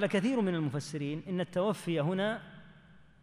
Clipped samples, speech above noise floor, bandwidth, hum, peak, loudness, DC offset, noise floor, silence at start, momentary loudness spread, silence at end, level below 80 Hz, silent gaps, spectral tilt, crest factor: under 0.1%; 26 dB; 14.5 kHz; none; -18 dBFS; -33 LUFS; under 0.1%; -58 dBFS; 0 s; 8 LU; 0.2 s; -68 dBFS; none; -6.5 dB/octave; 16 dB